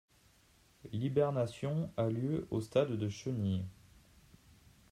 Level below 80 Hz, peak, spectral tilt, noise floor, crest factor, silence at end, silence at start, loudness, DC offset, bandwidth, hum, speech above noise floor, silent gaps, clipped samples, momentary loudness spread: -66 dBFS; -18 dBFS; -7.5 dB/octave; -67 dBFS; 20 dB; 1.2 s; 0.85 s; -36 LUFS; under 0.1%; 14 kHz; none; 32 dB; none; under 0.1%; 7 LU